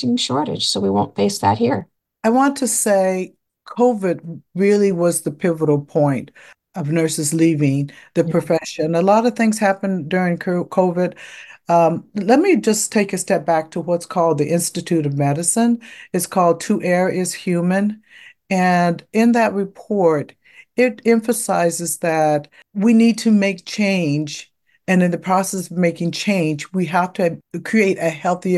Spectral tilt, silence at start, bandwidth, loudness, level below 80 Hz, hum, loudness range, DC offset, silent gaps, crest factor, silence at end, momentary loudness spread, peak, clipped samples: -5 dB/octave; 0 s; 12.5 kHz; -18 LUFS; -60 dBFS; none; 2 LU; under 0.1%; none; 16 dB; 0 s; 8 LU; -2 dBFS; under 0.1%